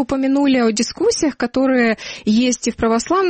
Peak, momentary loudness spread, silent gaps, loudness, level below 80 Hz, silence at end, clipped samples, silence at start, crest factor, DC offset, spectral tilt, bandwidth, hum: -6 dBFS; 4 LU; none; -17 LUFS; -46 dBFS; 0 s; under 0.1%; 0 s; 10 dB; under 0.1%; -4 dB/octave; 8.8 kHz; none